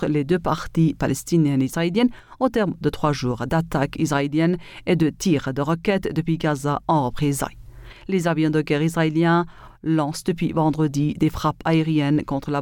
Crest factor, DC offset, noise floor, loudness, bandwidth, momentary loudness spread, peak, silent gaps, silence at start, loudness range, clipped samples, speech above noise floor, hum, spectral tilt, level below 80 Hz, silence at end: 16 dB; under 0.1%; -41 dBFS; -22 LUFS; 17.5 kHz; 5 LU; -6 dBFS; none; 0 s; 1 LU; under 0.1%; 20 dB; none; -6.5 dB/octave; -44 dBFS; 0 s